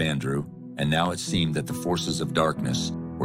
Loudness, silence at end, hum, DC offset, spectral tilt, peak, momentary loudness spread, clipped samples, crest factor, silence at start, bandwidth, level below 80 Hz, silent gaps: -26 LUFS; 0 s; none; under 0.1%; -5 dB/octave; -8 dBFS; 6 LU; under 0.1%; 18 dB; 0 s; 16 kHz; -52 dBFS; none